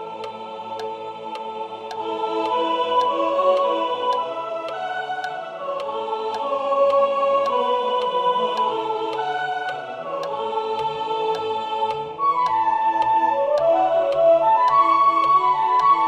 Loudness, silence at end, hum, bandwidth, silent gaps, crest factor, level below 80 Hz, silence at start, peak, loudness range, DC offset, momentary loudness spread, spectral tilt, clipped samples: -21 LUFS; 0 s; none; 10.5 kHz; none; 14 dB; -68 dBFS; 0 s; -6 dBFS; 7 LU; under 0.1%; 14 LU; -4.5 dB/octave; under 0.1%